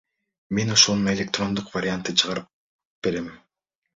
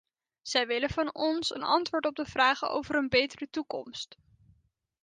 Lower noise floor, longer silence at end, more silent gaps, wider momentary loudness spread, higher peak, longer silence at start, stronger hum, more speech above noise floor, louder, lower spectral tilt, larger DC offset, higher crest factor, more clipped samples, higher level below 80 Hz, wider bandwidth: first, -79 dBFS vs -70 dBFS; second, 0.6 s vs 1 s; first, 2.53-2.79 s, 2.85-3.02 s vs none; about the same, 14 LU vs 12 LU; first, -2 dBFS vs -12 dBFS; about the same, 0.5 s vs 0.45 s; neither; first, 56 dB vs 40 dB; first, -22 LUFS vs -29 LUFS; about the same, -3 dB/octave vs -3.5 dB/octave; neither; about the same, 24 dB vs 20 dB; neither; about the same, -56 dBFS vs -60 dBFS; second, 7.8 kHz vs 9.8 kHz